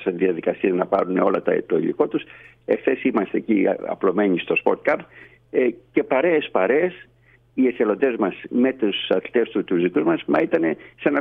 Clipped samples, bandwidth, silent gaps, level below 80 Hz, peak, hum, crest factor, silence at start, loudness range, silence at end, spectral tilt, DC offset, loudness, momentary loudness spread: under 0.1%; 4.6 kHz; none; -64 dBFS; -4 dBFS; none; 16 dB; 0 s; 1 LU; 0 s; -8.5 dB/octave; under 0.1%; -21 LUFS; 5 LU